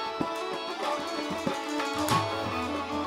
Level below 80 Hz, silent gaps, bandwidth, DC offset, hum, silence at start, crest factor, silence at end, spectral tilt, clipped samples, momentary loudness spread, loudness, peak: -60 dBFS; none; 16.5 kHz; under 0.1%; none; 0 s; 18 dB; 0 s; -4 dB/octave; under 0.1%; 5 LU; -30 LUFS; -12 dBFS